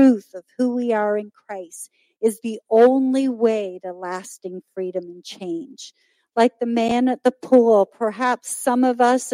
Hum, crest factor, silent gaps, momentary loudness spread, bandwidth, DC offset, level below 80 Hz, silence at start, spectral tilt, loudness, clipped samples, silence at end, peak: none; 18 dB; none; 19 LU; 16 kHz; under 0.1%; -68 dBFS; 0 s; -4.5 dB/octave; -20 LUFS; under 0.1%; 0 s; -2 dBFS